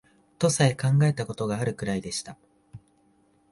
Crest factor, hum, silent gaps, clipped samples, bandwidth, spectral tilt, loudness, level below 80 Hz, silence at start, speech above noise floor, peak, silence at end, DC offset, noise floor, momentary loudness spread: 20 dB; none; none; under 0.1%; 11.5 kHz; -5.5 dB/octave; -26 LUFS; -58 dBFS; 0.4 s; 39 dB; -8 dBFS; 0.75 s; under 0.1%; -64 dBFS; 11 LU